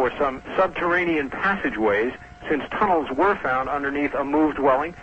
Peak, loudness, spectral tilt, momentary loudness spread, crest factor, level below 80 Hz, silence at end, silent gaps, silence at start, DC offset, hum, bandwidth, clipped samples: -8 dBFS; -22 LUFS; -7 dB/octave; 5 LU; 14 dB; -48 dBFS; 0 s; none; 0 s; under 0.1%; none; 8.2 kHz; under 0.1%